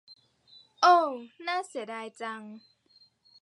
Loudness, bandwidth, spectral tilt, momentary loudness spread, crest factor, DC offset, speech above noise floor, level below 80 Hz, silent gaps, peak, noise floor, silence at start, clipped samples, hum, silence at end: -28 LUFS; 11.5 kHz; -2.5 dB/octave; 18 LU; 22 dB; under 0.1%; 36 dB; under -90 dBFS; none; -10 dBFS; -64 dBFS; 0.8 s; under 0.1%; none; 0.85 s